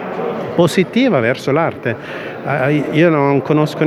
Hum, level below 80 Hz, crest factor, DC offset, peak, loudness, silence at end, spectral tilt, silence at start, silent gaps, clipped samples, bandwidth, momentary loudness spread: none; -56 dBFS; 14 dB; under 0.1%; 0 dBFS; -15 LUFS; 0 s; -7 dB/octave; 0 s; none; under 0.1%; 14 kHz; 9 LU